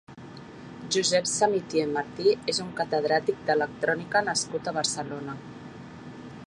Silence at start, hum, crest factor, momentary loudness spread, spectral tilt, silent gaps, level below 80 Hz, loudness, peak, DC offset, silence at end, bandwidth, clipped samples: 0.1 s; none; 18 dB; 19 LU; -3 dB/octave; none; -64 dBFS; -26 LUFS; -10 dBFS; under 0.1%; 0 s; 11.5 kHz; under 0.1%